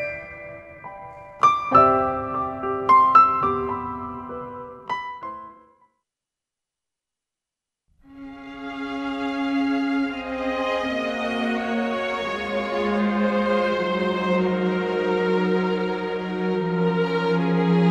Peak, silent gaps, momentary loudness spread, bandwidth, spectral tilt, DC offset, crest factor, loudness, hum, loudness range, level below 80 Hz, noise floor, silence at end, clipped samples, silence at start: -2 dBFS; none; 20 LU; 9.2 kHz; -7 dB/octave; under 0.1%; 20 dB; -22 LUFS; none; 17 LU; -54 dBFS; -87 dBFS; 0 s; under 0.1%; 0 s